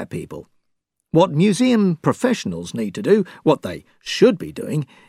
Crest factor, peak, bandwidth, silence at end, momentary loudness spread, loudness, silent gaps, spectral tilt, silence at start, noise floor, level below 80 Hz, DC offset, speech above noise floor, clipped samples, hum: 18 dB; -2 dBFS; 14.5 kHz; 0.25 s; 15 LU; -19 LUFS; none; -6 dB/octave; 0 s; -73 dBFS; -60 dBFS; under 0.1%; 54 dB; under 0.1%; none